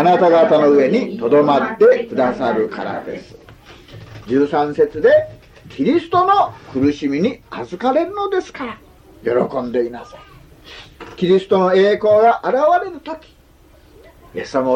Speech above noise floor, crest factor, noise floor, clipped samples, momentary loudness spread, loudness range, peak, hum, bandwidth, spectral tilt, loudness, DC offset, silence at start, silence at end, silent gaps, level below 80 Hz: 32 dB; 14 dB; -48 dBFS; under 0.1%; 18 LU; 6 LU; -2 dBFS; none; 8.4 kHz; -7 dB/octave; -16 LUFS; under 0.1%; 0 s; 0 s; none; -50 dBFS